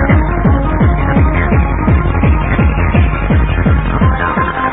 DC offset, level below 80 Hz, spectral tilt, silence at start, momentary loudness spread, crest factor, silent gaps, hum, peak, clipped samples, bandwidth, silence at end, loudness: 0.8%; -14 dBFS; -12 dB/octave; 0 s; 1 LU; 10 dB; none; none; 0 dBFS; under 0.1%; 3.9 kHz; 0 s; -12 LUFS